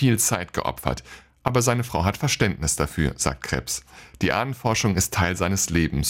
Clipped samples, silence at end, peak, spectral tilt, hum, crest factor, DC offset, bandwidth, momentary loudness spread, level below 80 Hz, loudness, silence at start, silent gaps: under 0.1%; 0 s; -6 dBFS; -4 dB/octave; none; 18 dB; under 0.1%; 17 kHz; 8 LU; -38 dBFS; -23 LUFS; 0 s; none